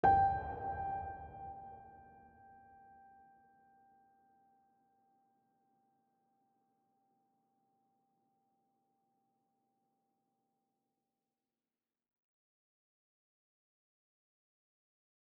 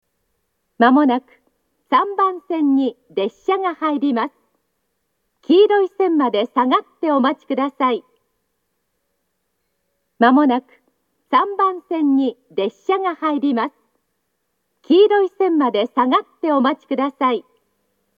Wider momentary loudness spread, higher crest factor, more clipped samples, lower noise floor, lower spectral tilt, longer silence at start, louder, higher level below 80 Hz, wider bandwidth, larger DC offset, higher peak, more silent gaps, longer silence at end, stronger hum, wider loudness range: first, 29 LU vs 9 LU; first, 28 dB vs 18 dB; neither; first, under -90 dBFS vs -72 dBFS; about the same, -6 dB/octave vs -6.5 dB/octave; second, 0.05 s vs 0.8 s; second, -38 LUFS vs -18 LUFS; first, -64 dBFS vs -80 dBFS; second, 4.2 kHz vs 5.2 kHz; neither; second, -18 dBFS vs 0 dBFS; neither; first, 13.25 s vs 0.75 s; neither; first, 26 LU vs 4 LU